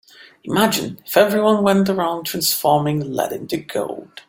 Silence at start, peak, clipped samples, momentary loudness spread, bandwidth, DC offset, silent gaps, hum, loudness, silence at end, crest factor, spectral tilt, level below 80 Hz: 0.45 s; 0 dBFS; under 0.1%; 10 LU; 17 kHz; under 0.1%; none; none; -19 LUFS; 0.1 s; 18 dB; -4.5 dB/octave; -58 dBFS